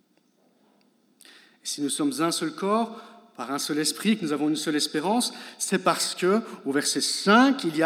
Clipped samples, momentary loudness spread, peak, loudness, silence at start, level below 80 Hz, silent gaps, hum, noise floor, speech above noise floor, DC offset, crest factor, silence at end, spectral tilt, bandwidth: under 0.1%; 12 LU; -6 dBFS; -25 LUFS; 1.65 s; under -90 dBFS; none; none; -65 dBFS; 40 dB; under 0.1%; 20 dB; 0 s; -3 dB/octave; 16.5 kHz